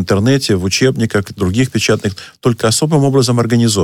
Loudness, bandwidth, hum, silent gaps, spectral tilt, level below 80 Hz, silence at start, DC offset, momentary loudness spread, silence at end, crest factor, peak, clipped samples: -14 LUFS; 16.5 kHz; none; none; -5 dB/octave; -44 dBFS; 0 s; under 0.1%; 5 LU; 0 s; 12 dB; -2 dBFS; under 0.1%